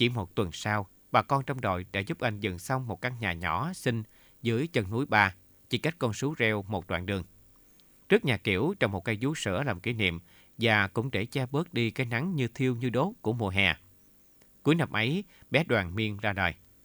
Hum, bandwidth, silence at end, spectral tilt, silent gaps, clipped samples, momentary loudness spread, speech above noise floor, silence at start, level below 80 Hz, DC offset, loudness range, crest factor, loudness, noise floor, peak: none; over 20 kHz; 0.3 s; -5.5 dB/octave; none; under 0.1%; 7 LU; 31 dB; 0 s; -58 dBFS; under 0.1%; 2 LU; 24 dB; -29 LUFS; -60 dBFS; -6 dBFS